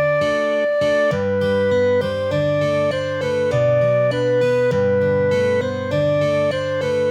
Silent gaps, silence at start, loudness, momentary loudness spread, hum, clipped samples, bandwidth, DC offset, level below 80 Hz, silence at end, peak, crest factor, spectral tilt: none; 0 s; -18 LUFS; 4 LU; none; under 0.1%; 10.5 kHz; under 0.1%; -50 dBFS; 0 s; -8 dBFS; 10 dB; -6.5 dB/octave